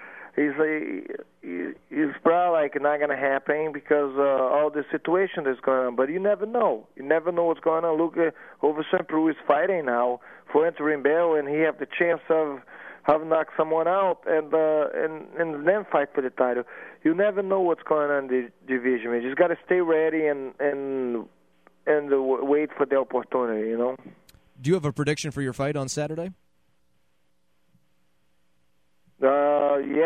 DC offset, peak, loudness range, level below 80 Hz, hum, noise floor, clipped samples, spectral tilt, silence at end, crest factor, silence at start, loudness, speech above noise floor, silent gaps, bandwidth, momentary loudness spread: under 0.1%; -6 dBFS; 5 LU; -68 dBFS; none; -73 dBFS; under 0.1%; -6 dB/octave; 0 s; 20 dB; 0 s; -25 LUFS; 49 dB; none; 11 kHz; 8 LU